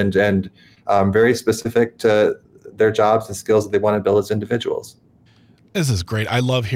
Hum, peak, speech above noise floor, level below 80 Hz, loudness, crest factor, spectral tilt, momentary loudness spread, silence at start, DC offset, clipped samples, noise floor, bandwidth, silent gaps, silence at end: none; -4 dBFS; 34 dB; -54 dBFS; -18 LUFS; 14 dB; -6 dB/octave; 8 LU; 0 s; under 0.1%; under 0.1%; -52 dBFS; 16 kHz; none; 0 s